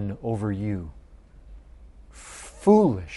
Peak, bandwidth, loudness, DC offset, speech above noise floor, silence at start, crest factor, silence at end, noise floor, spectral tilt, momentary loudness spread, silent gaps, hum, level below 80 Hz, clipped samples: -6 dBFS; 11.5 kHz; -23 LUFS; under 0.1%; 26 dB; 0 s; 20 dB; 0 s; -49 dBFS; -8 dB/octave; 24 LU; none; none; -48 dBFS; under 0.1%